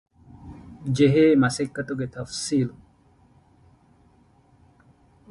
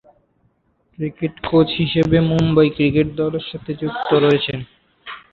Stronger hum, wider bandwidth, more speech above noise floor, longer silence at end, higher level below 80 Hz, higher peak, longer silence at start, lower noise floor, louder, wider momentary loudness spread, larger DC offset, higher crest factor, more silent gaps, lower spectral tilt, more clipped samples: neither; first, 11.5 kHz vs 7 kHz; second, 37 dB vs 45 dB; first, 2.6 s vs 0.15 s; second, -56 dBFS vs -44 dBFS; second, -8 dBFS vs -2 dBFS; second, 0.4 s vs 1 s; second, -58 dBFS vs -62 dBFS; second, -22 LUFS vs -18 LUFS; first, 23 LU vs 13 LU; neither; about the same, 18 dB vs 16 dB; neither; second, -6 dB/octave vs -8 dB/octave; neither